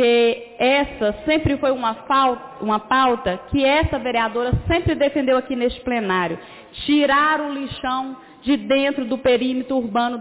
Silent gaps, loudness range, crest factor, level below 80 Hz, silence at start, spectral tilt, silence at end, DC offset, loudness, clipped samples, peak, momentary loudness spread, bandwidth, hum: none; 1 LU; 12 dB; -38 dBFS; 0 s; -9.5 dB/octave; 0 s; under 0.1%; -20 LUFS; under 0.1%; -8 dBFS; 8 LU; 4 kHz; none